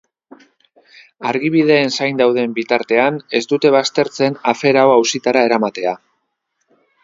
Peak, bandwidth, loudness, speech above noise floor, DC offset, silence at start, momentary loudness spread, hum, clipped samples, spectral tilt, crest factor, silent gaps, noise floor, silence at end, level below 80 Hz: 0 dBFS; 7.8 kHz; -15 LUFS; 56 dB; under 0.1%; 1.2 s; 8 LU; none; under 0.1%; -4.5 dB/octave; 16 dB; none; -70 dBFS; 1.1 s; -64 dBFS